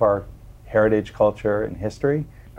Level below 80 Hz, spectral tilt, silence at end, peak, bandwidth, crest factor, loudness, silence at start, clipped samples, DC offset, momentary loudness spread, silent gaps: -44 dBFS; -8 dB/octave; 0 s; -4 dBFS; 9 kHz; 16 dB; -22 LUFS; 0 s; under 0.1%; under 0.1%; 8 LU; none